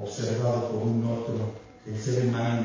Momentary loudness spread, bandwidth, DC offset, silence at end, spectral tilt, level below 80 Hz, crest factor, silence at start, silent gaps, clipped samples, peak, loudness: 9 LU; 7.6 kHz; under 0.1%; 0 s; -7 dB/octave; -58 dBFS; 14 dB; 0 s; none; under 0.1%; -14 dBFS; -28 LUFS